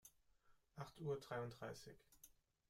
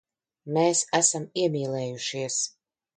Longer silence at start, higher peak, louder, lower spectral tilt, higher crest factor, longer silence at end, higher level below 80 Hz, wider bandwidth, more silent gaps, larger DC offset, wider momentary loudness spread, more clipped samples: second, 0.05 s vs 0.45 s; second, -36 dBFS vs -8 dBFS; second, -51 LUFS vs -25 LUFS; first, -5.5 dB/octave vs -3 dB/octave; about the same, 18 dB vs 20 dB; about the same, 0.4 s vs 0.5 s; about the same, -78 dBFS vs -74 dBFS; first, 16 kHz vs 9.6 kHz; neither; neither; first, 20 LU vs 9 LU; neither